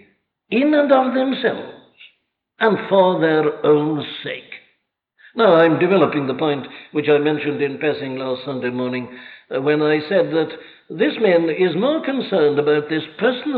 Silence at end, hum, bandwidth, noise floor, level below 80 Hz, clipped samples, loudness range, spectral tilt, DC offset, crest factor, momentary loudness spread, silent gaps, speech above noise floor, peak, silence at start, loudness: 0 s; none; 4.8 kHz; -68 dBFS; -68 dBFS; under 0.1%; 4 LU; -9.5 dB/octave; under 0.1%; 16 dB; 13 LU; none; 50 dB; -2 dBFS; 0.5 s; -18 LUFS